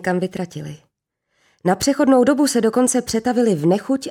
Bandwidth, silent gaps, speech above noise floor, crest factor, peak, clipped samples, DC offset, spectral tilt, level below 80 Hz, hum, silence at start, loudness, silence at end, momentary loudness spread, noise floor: 16.5 kHz; none; 56 dB; 14 dB; -4 dBFS; under 0.1%; under 0.1%; -5 dB/octave; -54 dBFS; none; 0 s; -18 LUFS; 0 s; 14 LU; -73 dBFS